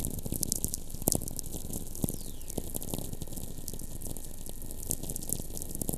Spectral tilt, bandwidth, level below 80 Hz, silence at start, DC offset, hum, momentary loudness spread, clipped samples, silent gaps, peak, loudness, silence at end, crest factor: -4 dB/octave; 15.5 kHz; -42 dBFS; 0 s; under 0.1%; none; 11 LU; under 0.1%; none; -4 dBFS; -36 LUFS; 0 s; 30 dB